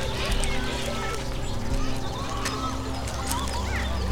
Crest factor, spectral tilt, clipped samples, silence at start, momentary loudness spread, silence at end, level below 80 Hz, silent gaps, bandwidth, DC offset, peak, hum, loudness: 20 dB; -4 dB/octave; under 0.1%; 0 s; 4 LU; 0 s; -32 dBFS; none; 17.5 kHz; under 0.1%; -8 dBFS; none; -29 LUFS